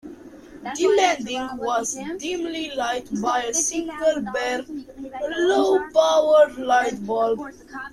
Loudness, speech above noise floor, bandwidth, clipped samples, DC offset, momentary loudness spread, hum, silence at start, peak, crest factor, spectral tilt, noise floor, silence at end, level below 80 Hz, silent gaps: -22 LUFS; 21 dB; 13.5 kHz; under 0.1%; under 0.1%; 15 LU; none; 0.05 s; -4 dBFS; 18 dB; -2.5 dB/octave; -42 dBFS; 0.05 s; -56 dBFS; none